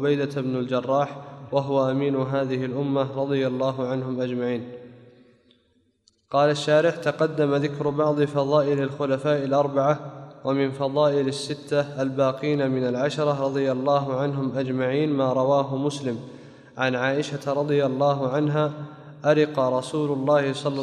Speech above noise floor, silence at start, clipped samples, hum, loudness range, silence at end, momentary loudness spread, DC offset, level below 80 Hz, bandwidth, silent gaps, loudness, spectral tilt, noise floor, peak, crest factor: 43 dB; 0 s; under 0.1%; none; 3 LU; 0 s; 6 LU; under 0.1%; -68 dBFS; 11 kHz; none; -24 LUFS; -6.5 dB/octave; -66 dBFS; -8 dBFS; 16 dB